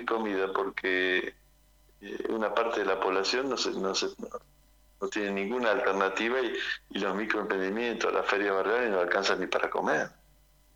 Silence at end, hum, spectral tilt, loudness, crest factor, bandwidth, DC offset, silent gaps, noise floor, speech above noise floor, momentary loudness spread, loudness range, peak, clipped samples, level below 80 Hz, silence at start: 0.65 s; none; -3.5 dB/octave; -29 LUFS; 20 dB; 17 kHz; under 0.1%; none; -62 dBFS; 32 dB; 9 LU; 2 LU; -10 dBFS; under 0.1%; -64 dBFS; 0 s